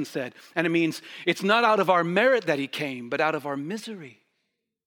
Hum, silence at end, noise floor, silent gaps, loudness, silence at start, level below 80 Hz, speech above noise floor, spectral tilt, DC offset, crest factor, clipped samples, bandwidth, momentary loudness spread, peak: none; 0.8 s; -79 dBFS; none; -24 LUFS; 0 s; -80 dBFS; 54 dB; -5 dB/octave; under 0.1%; 20 dB; under 0.1%; 19 kHz; 14 LU; -6 dBFS